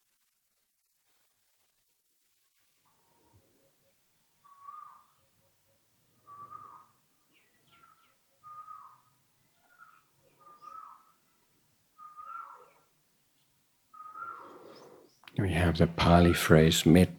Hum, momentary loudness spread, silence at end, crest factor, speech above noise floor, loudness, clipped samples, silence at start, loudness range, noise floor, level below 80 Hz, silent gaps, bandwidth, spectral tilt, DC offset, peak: none; 30 LU; 0.05 s; 28 dB; 54 dB; -25 LUFS; under 0.1%; 4.75 s; 28 LU; -77 dBFS; -50 dBFS; none; 19 kHz; -6 dB/octave; under 0.1%; -6 dBFS